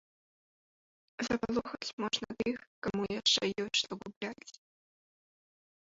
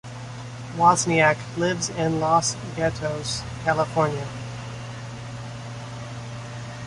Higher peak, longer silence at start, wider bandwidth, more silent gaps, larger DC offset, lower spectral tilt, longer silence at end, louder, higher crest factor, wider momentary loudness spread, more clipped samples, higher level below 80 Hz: second, -16 dBFS vs -4 dBFS; first, 1.2 s vs 0.05 s; second, 8 kHz vs 11.5 kHz; first, 1.93-1.98 s, 2.67-2.82 s, 4.16-4.21 s vs none; neither; second, -2 dB/octave vs -4.5 dB/octave; first, 1.45 s vs 0 s; second, -34 LUFS vs -23 LUFS; about the same, 22 dB vs 20 dB; second, 14 LU vs 17 LU; neither; second, -66 dBFS vs -50 dBFS